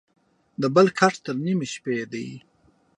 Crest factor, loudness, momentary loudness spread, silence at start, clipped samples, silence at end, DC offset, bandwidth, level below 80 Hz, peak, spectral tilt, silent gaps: 22 dB; -23 LUFS; 16 LU; 0.6 s; under 0.1%; 0.6 s; under 0.1%; 10.5 kHz; -70 dBFS; -4 dBFS; -5.5 dB/octave; none